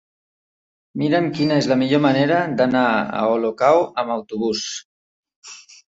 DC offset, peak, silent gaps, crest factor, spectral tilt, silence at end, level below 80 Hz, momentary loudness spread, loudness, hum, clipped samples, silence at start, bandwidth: under 0.1%; -2 dBFS; 4.85-5.23 s, 5.36-5.42 s; 18 dB; -5.5 dB/octave; 0.35 s; -62 dBFS; 15 LU; -19 LUFS; none; under 0.1%; 0.95 s; 8 kHz